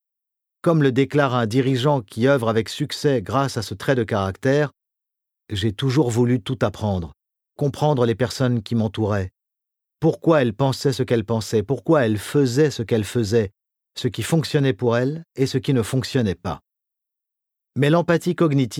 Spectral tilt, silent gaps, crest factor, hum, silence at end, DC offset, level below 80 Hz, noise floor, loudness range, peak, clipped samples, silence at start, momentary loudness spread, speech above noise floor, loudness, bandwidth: -6.5 dB/octave; none; 18 dB; none; 0 s; under 0.1%; -54 dBFS; -84 dBFS; 3 LU; -4 dBFS; under 0.1%; 0.65 s; 8 LU; 64 dB; -21 LUFS; 16 kHz